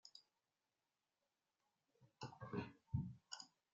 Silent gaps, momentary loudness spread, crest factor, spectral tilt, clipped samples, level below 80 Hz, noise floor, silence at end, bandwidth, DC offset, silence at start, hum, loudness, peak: none; 12 LU; 24 dB; -6 dB/octave; under 0.1%; -72 dBFS; under -90 dBFS; 0.25 s; 7.6 kHz; under 0.1%; 0.05 s; none; -51 LUFS; -30 dBFS